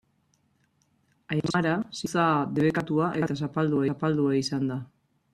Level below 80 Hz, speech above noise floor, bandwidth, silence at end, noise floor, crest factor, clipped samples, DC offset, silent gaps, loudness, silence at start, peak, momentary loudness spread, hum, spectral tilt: -64 dBFS; 43 dB; 13 kHz; 0.5 s; -69 dBFS; 18 dB; under 0.1%; under 0.1%; none; -27 LUFS; 1.3 s; -10 dBFS; 6 LU; none; -6.5 dB/octave